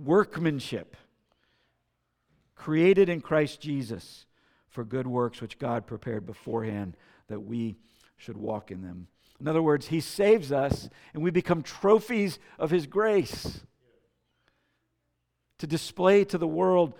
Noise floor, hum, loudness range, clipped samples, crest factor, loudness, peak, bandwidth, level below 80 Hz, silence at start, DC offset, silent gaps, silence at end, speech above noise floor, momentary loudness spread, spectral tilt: -78 dBFS; none; 8 LU; under 0.1%; 20 dB; -27 LUFS; -8 dBFS; 17 kHz; -56 dBFS; 0 s; under 0.1%; none; 0.05 s; 51 dB; 18 LU; -6.5 dB/octave